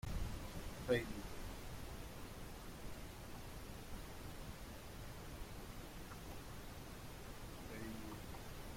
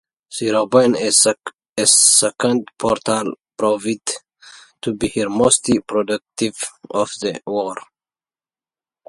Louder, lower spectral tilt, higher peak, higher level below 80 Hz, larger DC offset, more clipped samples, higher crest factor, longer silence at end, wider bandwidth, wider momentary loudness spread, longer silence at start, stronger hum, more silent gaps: second, -50 LUFS vs -17 LUFS; first, -5 dB/octave vs -2.5 dB/octave; second, -24 dBFS vs 0 dBFS; about the same, -54 dBFS vs -54 dBFS; neither; neither; about the same, 22 dB vs 20 dB; second, 0 s vs 1.25 s; first, 16.5 kHz vs 12 kHz; second, 6 LU vs 16 LU; second, 0.05 s vs 0.3 s; neither; second, none vs 1.72-1.76 s